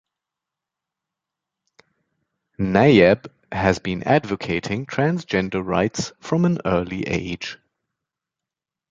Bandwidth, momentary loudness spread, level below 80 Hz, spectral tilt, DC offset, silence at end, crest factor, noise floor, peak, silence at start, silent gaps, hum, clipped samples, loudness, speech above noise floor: 7.8 kHz; 13 LU; -48 dBFS; -6 dB/octave; under 0.1%; 1.35 s; 20 dB; -87 dBFS; -2 dBFS; 2.6 s; none; none; under 0.1%; -21 LUFS; 67 dB